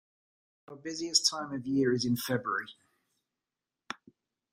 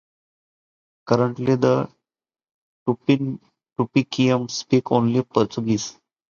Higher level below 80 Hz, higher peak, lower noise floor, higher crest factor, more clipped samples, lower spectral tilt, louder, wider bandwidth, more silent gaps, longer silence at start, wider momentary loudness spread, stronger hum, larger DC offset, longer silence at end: second, -72 dBFS vs -60 dBFS; second, -10 dBFS vs -2 dBFS; about the same, under -90 dBFS vs -90 dBFS; about the same, 24 dB vs 20 dB; neither; second, -3 dB/octave vs -6.5 dB/octave; second, -30 LUFS vs -21 LUFS; first, 15.5 kHz vs 7.4 kHz; second, none vs 2.51-2.86 s; second, 0.7 s vs 1.05 s; first, 19 LU vs 10 LU; neither; neither; about the same, 0.6 s vs 0.5 s